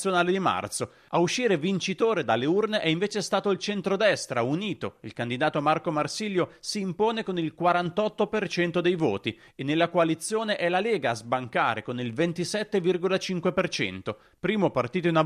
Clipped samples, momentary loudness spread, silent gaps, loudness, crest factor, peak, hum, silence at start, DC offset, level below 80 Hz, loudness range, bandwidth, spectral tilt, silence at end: under 0.1%; 7 LU; none; -26 LUFS; 16 dB; -10 dBFS; none; 0 s; under 0.1%; -66 dBFS; 2 LU; 14 kHz; -5 dB/octave; 0 s